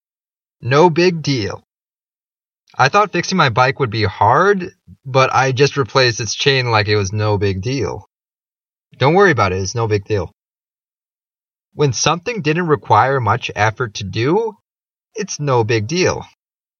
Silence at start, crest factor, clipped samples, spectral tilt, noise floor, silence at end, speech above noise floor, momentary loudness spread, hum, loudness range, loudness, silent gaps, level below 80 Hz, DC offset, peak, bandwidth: 0.6 s; 16 dB; under 0.1%; -5 dB/octave; under -90 dBFS; 0.55 s; over 74 dB; 11 LU; none; 4 LU; -16 LUFS; none; -50 dBFS; under 0.1%; 0 dBFS; 7.2 kHz